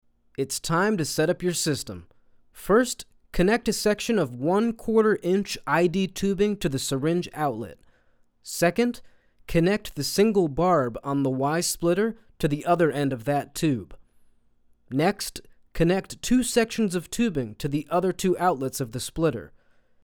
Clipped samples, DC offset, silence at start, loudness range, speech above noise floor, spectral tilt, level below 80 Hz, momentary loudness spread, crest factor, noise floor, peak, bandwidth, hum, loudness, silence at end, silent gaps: under 0.1%; under 0.1%; 0.4 s; 3 LU; 37 dB; -5 dB/octave; -46 dBFS; 10 LU; 18 dB; -62 dBFS; -8 dBFS; over 20 kHz; none; -25 LUFS; 0.6 s; none